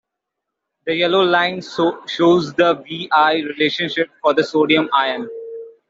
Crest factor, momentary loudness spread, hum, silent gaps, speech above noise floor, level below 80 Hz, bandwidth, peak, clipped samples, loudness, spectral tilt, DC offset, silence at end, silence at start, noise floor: 16 dB; 9 LU; none; none; 63 dB; -64 dBFS; 7.6 kHz; -2 dBFS; under 0.1%; -17 LUFS; -5.5 dB/octave; under 0.1%; 0.2 s; 0.85 s; -80 dBFS